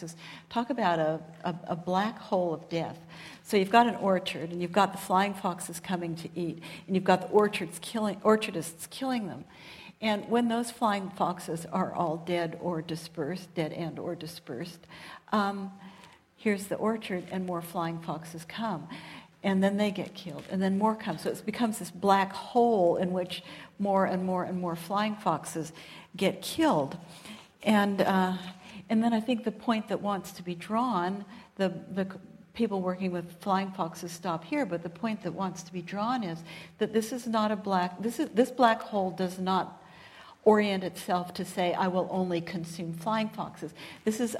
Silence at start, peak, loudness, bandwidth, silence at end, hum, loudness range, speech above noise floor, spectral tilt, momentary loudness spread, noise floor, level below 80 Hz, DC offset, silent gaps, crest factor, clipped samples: 0 s; -6 dBFS; -30 LUFS; 16 kHz; 0 s; none; 6 LU; 25 dB; -5.5 dB/octave; 15 LU; -55 dBFS; -70 dBFS; under 0.1%; none; 24 dB; under 0.1%